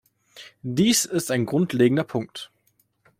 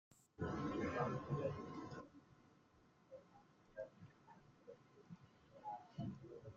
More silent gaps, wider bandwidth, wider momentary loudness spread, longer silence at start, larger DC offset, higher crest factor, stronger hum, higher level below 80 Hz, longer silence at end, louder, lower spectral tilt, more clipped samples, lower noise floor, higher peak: neither; first, 16.5 kHz vs 7.4 kHz; second, 17 LU vs 23 LU; first, 0.35 s vs 0.1 s; neither; about the same, 18 dB vs 22 dB; neither; first, -62 dBFS vs -72 dBFS; first, 0.75 s vs 0 s; first, -22 LUFS vs -47 LUFS; second, -4.5 dB/octave vs -7 dB/octave; neither; second, -67 dBFS vs -72 dBFS; first, -6 dBFS vs -28 dBFS